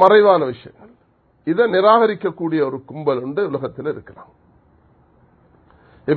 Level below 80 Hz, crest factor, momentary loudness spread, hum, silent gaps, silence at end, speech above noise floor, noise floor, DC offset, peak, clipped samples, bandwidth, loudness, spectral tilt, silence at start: -60 dBFS; 18 dB; 16 LU; none; none; 0 s; 41 dB; -58 dBFS; under 0.1%; 0 dBFS; under 0.1%; 4.5 kHz; -18 LUFS; -8.5 dB/octave; 0 s